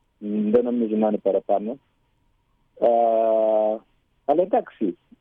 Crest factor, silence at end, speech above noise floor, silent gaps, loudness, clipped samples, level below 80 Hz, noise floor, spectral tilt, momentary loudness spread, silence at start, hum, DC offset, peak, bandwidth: 16 dB; 0.25 s; 45 dB; none; -22 LUFS; under 0.1%; -66 dBFS; -66 dBFS; -10.5 dB/octave; 10 LU; 0.2 s; none; under 0.1%; -8 dBFS; 3.8 kHz